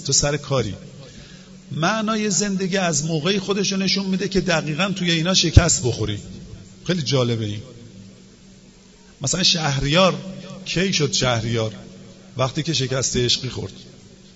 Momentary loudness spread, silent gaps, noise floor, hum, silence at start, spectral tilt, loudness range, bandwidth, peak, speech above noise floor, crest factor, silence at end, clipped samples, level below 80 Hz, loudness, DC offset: 18 LU; none; -48 dBFS; none; 0 s; -4 dB/octave; 4 LU; 8 kHz; 0 dBFS; 28 dB; 22 dB; 0.2 s; under 0.1%; -36 dBFS; -20 LUFS; under 0.1%